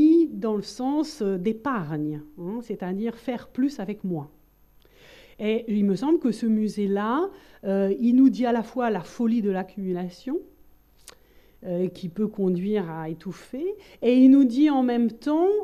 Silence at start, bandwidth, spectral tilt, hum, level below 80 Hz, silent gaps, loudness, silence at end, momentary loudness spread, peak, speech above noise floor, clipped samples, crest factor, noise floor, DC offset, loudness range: 0 s; 13.5 kHz; -7.5 dB/octave; none; -60 dBFS; none; -24 LUFS; 0 s; 14 LU; -6 dBFS; 33 dB; under 0.1%; 18 dB; -57 dBFS; under 0.1%; 8 LU